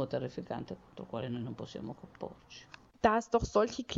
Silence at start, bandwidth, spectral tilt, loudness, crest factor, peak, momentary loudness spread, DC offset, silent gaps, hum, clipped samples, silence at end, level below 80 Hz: 0 s; 8 kHz; -5.5 dB/octave; -34 LUFS; 22 dB; -14 dBFS; 19 LU; under 0.1%; none; none; under 0.1%; 0 s; -54 dBFS